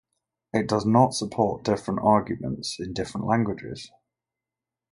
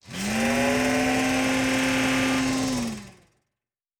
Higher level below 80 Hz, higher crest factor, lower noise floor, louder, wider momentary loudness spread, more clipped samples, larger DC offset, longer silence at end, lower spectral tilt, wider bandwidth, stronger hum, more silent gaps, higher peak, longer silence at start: second, -54 dBFS vs -48 dBFS; first, 22 dB vs 14 dB; about the same, -89 dBFS vs -88 dBFS; about the same, -25 LUFS vs -23 LUFS; first, 12 LU vs 6 LU; neither; neither; first, 1.05 s vs 0.9 s; first, -6 dB/octave vs -3.5 dB/octave; second, 11.5 kHz vs 18 kHz; neither; neither; first, -4 dBFS vs -12 dBFS; first, 0.55 s vs 0.05 s